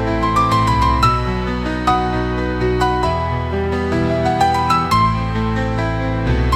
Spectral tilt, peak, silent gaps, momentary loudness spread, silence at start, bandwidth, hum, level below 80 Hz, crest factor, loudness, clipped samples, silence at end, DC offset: -6.5 dB/octave; -2 dBFS; none; 5 LU; 0 s; 15.5 kHz; none; -26 dBFS; 14 dB; -17 LUFS; under 0.1%; 0 s; under 0.1%